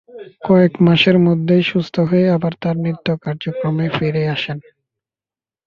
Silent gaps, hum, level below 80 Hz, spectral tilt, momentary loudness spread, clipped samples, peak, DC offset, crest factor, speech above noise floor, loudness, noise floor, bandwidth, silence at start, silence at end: none; none; -54 dBFS; -8.5 dB/octave; 10 LU; under 0.1%; -2 dBFS; under 0.1%; 14 dB; over 75 dB; -16 LUFS; under -90 dBFS; 6.6 kHz; 0.15 s; 1.05 s